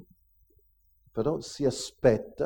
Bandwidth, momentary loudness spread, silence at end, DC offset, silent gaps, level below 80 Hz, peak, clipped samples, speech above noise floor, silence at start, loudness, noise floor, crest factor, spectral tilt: 18 kHz; 6 LU; 0 s; under 0.1%; none; -54 dBFS; -8 dBFS; under 0.1%; 38 dB; 1.15 s; -29 LUFS; -65 dBFS; 22 dB; -5.5 dB/octave